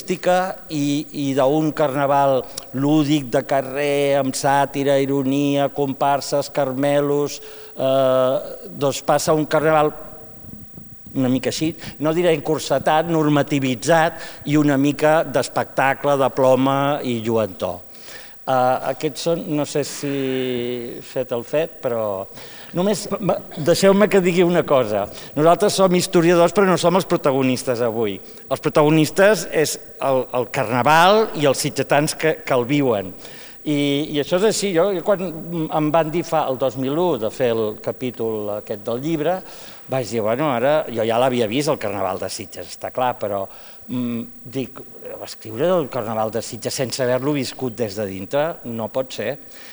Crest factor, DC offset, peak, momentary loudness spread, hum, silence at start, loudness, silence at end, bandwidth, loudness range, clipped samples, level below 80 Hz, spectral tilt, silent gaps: 20 dB; under 0.1%; 0 dBFS; 13 LU; none; 0 s; -20 LUFS; 0 s; over 20 kHz; 7 LU; under 0.1%; -58 dBFS; -5 dB/octave; none